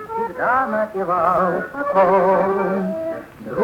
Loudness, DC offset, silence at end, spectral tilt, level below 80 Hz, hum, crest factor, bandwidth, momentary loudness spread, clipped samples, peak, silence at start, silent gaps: -19 LUFS; under 0.1%; 0 s; -8 dB/octave; -54 dBFS; none; 14 dB; 17 kHz; 11 LU; under 0.1%; -4 dBFS; 0 s; none